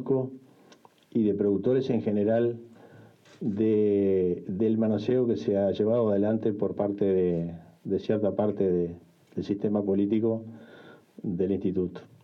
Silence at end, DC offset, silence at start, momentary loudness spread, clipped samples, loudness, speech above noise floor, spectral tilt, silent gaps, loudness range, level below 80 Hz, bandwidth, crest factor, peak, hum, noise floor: 0.2 s; under 0.1%; 0 s; 11 LU; under 0.1%; -27 LUFS; 31 dB; -9.5 dB/octave; none; 4 LU; -70 dBFS; 6.6 kHz; 14 dB; -14 dBFS; none; -57 dBFS